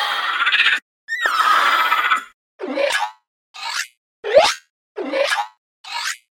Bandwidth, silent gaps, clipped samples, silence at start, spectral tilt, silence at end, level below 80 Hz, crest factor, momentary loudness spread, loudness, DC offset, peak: 17 kHz; 0.82-1.08 s, 2.34-2.59 s, 3.27-3.54 s, 3.97-4.23 s, 4.70-4.95 s, 5.58-5.84 s; under 0.1%; 0 s; 0.5 dB/octave; 0.15 s; -64 dBFS; 20 dB; 16 LU; -18 LUFS; under 0.1%; 0 dBFS